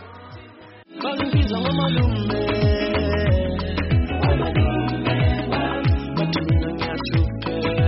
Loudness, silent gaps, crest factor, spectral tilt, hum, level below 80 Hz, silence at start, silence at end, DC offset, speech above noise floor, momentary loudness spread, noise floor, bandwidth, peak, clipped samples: -21 LUFS; none; 12 dB; -5.5 dB/octave; none; -28 dBFS; 0 s; 0 s; under 0.1%; 24 dB; 6 LU; -44 dBFS; 5.8 kHz; -8 dBFS; under 0.1%